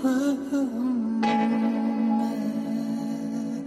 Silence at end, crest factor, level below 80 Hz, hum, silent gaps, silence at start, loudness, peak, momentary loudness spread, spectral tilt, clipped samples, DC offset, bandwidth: 0 s; 12 dB; -70 dBFS; none; none; 0 s; -26 LUFS; -12 dBFS; 6 LU; -6 dB/octave; under 0.1%; under 0.1%; 13 kHz